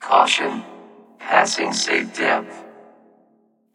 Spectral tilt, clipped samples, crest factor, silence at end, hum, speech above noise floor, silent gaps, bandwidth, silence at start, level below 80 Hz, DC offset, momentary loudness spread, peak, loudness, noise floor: -1.5 dB/octave; under 0.1%; 22 dB; 1.05 s; none; 42 dB; none; 17 kHz; 0 s; -88 dBFS; under 0.1%; 22 LU; 0 dBFS; -19 LUFS; -61 dBFS